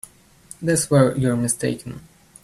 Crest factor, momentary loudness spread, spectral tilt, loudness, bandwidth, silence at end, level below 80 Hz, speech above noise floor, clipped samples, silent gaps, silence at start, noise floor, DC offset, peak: 20 dB; 17 LU; -5.5 dB/octave; -20 LUFS; 13.5 kHz; 0.45 s; -52 dBFS; 26 dB; under 0.1%; none; 0.6 s; -46 dBFS; under 0.1%; -2 dBFS